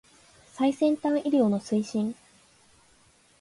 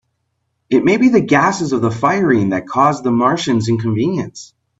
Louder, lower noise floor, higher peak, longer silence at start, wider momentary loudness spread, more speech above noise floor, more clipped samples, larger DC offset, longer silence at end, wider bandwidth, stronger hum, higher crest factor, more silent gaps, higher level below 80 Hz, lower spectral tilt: second, -26 LUFS vs -15 LUFS; second, -61 dBFS vs -69 dBFS; second, -12 dBFS vs 0 dBFS; second, 0.55 s vs 0.7 s; about the same, 8 LU vs 6 LU; second, 36 dB vs 55 dB; neither; neither; first, 1.25 s vs 0.35 s; first, 11.5 kHz vs 8 kHz; neither; about the same, 16 dB vs 16 dB; neither; second, -70 dBFS vs -54 dBFS; about the same, -6.5 dB/octave vs -6 dB/octave